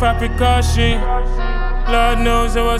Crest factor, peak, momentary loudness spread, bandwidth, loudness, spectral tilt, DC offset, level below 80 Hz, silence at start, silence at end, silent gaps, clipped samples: 12 dB; -2 dBFS; 8 LU; 13.5 kHz; -17 LUFS; -5 dB/octave; under 0.1%; -16 dBFS; 0 s; 0 s; none; under 0.1%